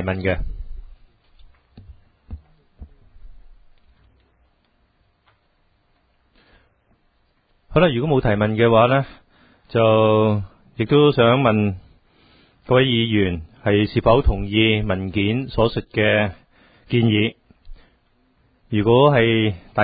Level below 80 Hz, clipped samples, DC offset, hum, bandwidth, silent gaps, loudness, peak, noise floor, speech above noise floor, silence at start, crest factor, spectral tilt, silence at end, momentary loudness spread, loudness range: -36 dBFS; under 0.1%; under 0.1%; none; 5 kHz; none; -18 LUFS; -2 dBFS; -63 dBFS; 46 dB; 0 s; 18 dB; -11.5 dB/octave; 0 s; 11 LU; 5 LU